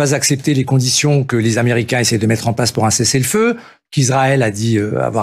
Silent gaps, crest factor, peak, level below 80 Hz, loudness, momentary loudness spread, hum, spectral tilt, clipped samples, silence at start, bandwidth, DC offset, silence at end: none; 12 dB; -2 dBFS; -50 dBFS; -14 LUFS; 4 LU; none; -4.5 dB/octave; under 0.1%; 0 s; 15 kHz; under 0.1%; 0 s